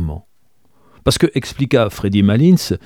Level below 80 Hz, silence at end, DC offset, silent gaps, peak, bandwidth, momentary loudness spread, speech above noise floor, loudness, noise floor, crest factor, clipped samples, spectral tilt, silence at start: -36 dBFS; 0.1 s; 0.2%; none; 0 dBFS; 17 kHz; 9 LU; 48 dB; -15 LUFS; -62 dBFS; 16 dB; under 0.1%; -6 dB/octave; 0 s